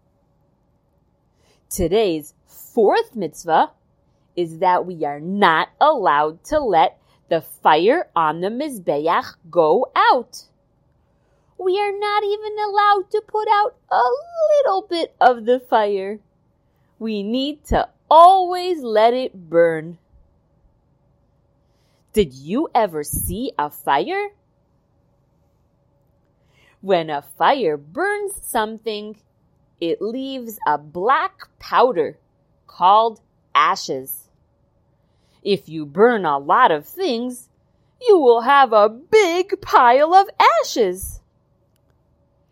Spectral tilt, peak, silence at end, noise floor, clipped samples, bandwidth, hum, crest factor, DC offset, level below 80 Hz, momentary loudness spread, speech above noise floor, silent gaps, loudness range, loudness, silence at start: -4 dB/octave; 0 dBFS; 1.35 s; -62 dBFS; under 0.1%; 16 kHz; none; 20 dB; under 0.1%; -46 dBFS; 13 LU; 45 dB; none; 8 LU; -18 LUFS; 1.7 s